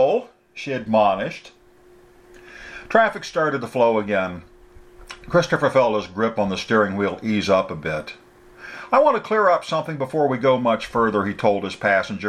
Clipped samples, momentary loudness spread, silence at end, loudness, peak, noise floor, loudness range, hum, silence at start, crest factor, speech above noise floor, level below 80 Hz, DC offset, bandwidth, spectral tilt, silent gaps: under 0.1%; 19 LU; 0 s; -20 LUFS; -2 dBFS; -51 dBFS; 3 LU; none; 0 s; 20 dB; 31 dB; -54 dBFS; under 0.1%; 12 kHz; -6 dB/octave; none